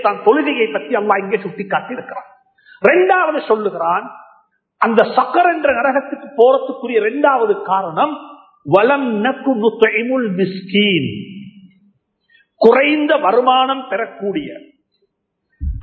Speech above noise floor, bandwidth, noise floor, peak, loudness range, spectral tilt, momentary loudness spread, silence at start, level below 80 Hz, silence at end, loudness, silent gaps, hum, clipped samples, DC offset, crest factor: 53 dB; 4.5 kHz; -68 dBFS; 0 dBFS; 2 LU; -8 dB/octave; 14 LU; 0 s; -40 dBFS; 0 s; -15 LUFS; none; none; under 0.1%; under 0.1%; 16 dB